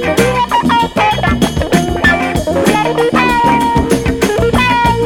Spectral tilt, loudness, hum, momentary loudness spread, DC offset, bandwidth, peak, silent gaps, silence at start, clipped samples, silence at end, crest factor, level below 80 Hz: -5 dB/octave; -12 LUFS; none; 3 LU; under 0.1%; 18 kHz; 0 dBFS; none; 0 s; under 0.1%; 0 s; 12 dB; -26 dBFS